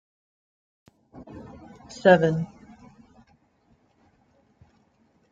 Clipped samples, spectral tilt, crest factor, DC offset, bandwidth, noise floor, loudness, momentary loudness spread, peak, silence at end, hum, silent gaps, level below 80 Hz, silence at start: under 0.1%; -7 dB/octave; 24 dB; under 0.1%; 7.6 kHz; -65 dBFS; -21 LUFS; 27 LU; -4 dBFS; 2.85 s; none; none; -62 dBFS; 1.35 s